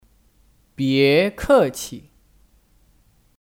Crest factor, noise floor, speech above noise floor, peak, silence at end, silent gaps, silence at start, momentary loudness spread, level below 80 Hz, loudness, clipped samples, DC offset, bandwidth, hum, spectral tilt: 18 dB; -58 dBFS; 40 dB; -4 dBFS; 1.45 s; none; 0.8 s; 17 LU; -46 dBFS; -18 LUFS; under 0.1%; under 0.1%; 17.5 kHz; none; -5 dB/octave